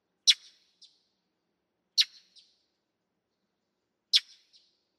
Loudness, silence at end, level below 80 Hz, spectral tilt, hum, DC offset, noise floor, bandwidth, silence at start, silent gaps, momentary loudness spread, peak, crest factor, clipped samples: -26 LUFS; 0.8 s; under -90 dBFS; 7 dB/octave; none; under 0.1%; -82 dBFS; 14.5 kHz; 0.25 s; none; 5 LU; -8 dBFS; 28 dB; under 0.1%